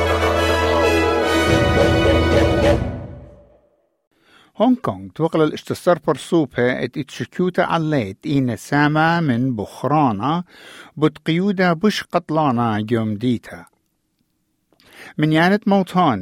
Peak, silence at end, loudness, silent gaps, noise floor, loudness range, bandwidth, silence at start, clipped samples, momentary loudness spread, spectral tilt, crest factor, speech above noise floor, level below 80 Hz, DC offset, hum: -2 dBFS; 0 s; -18 LUFS; 4.07-4.11 s; -68 dBFS; 5 LU; 16 kHz; 0 s; under 0.1%; 9 LU; -6.5 dB/octave; 16 dB; 50 dB; -38 dBFS; under 0.1%; none